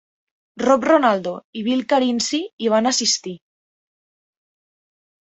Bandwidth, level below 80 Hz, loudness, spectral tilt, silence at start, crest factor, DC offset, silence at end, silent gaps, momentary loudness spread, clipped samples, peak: 8.2 kHz; -66 dBFS; -19 LUFS; -3 dB/octave; 0.55 s; 20 dB; under 0.1%; 1.95 s; 1.44-1.53 s, 2.53-2.58 s; 11 LU; under 0.1%; -2 dBFS